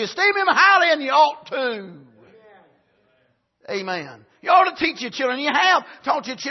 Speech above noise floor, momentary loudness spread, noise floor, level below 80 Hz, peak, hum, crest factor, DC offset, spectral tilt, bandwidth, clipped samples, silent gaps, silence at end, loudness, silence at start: 45 dB; 15 LU; -65 dBFS; -68 dBFS; -2 dBFS; none; 18 dB; under 0.1%; -2.5 dB/octave; 6.2 kHz; under 0.1%; none; 0 s; -19 LUFS; 0 s